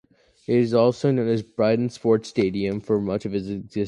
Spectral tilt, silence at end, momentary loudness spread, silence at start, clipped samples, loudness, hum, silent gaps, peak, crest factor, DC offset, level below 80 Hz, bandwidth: -7.5 dB/octave; 0 s; 8 LU; 0.5 s; under 0.1%; -23 LUFS; none; none; -6 dBFS; 16 dB; under 0.1%; -56 dBFS; 11 kHz